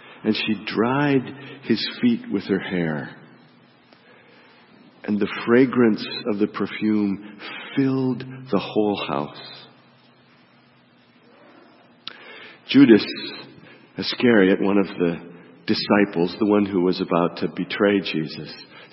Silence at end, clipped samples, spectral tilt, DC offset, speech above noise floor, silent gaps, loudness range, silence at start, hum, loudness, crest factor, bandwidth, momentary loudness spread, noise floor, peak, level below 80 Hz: 0.1 s; under 0.1%; -10 dB/octave; under 0.1%; 34 dB; none; 9 LU; 0.05 s; none; -21 LUFS; 22 dB; 5.8 kHz; 20 LU; -55 dBFS; -2 dBFS; -66 dBFS